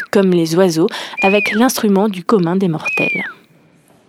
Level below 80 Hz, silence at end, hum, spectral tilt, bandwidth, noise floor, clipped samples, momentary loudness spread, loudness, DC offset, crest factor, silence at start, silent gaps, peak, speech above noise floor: -62 dBFS; 0.75 s; none; -5.5 dB/octave; 16.5 kHz; -50 dBFS; under 0.1%; 4 LU; -14 LUFS; under 0.1%; 14 dB; 0 s; none; 0 dBFS; 36 dB